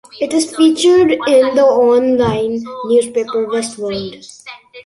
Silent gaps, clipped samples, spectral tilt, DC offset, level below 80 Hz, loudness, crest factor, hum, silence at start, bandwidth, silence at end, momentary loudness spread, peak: none; under 0.1%; -4.5 dB/octave; under 0.1%; -48 dBFS; -13 LUFS; 12 dB; none; 0.15 s; 11.5 kHz; 0.05 s; 17 LU; -2 dBFS